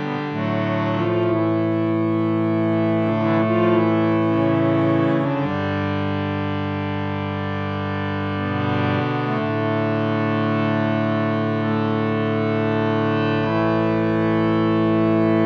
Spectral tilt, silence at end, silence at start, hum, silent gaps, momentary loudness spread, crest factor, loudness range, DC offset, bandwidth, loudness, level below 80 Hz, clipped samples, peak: -9 dB/octave; 0 s; 0 s; none; none; 6 LU; 14 dB; 4 LU; under 0.1%; 6.2 kHz; -21 LUFS; -54 dBFS; under 0.1%; -6 dBFS